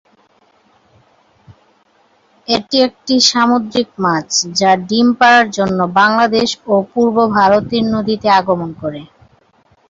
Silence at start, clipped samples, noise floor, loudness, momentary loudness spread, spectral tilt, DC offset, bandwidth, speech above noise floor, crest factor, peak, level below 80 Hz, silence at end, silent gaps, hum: 1.5 s; under 0.1%; -54 dBFS; -13 LUFS; 9 LU; -3.5 dB/octave; under 0.1%; 7.8 kHz; 41 dB; 14 dB; 0 dBFS; -52 dBFS; 0.85 s; none; none